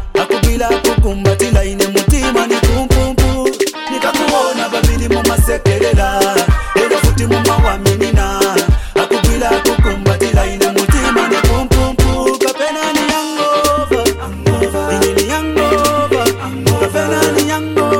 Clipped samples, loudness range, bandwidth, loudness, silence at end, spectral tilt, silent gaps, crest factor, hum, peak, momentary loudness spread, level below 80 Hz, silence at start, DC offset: under 0.1%; 1 LU; 17.5 kHz; -13 LUFS; 0 s; -5 dB/octave; none; 12 dB; none; 0 dBFS; 3 LU; -18 dBFS; 0 s; under 0.1%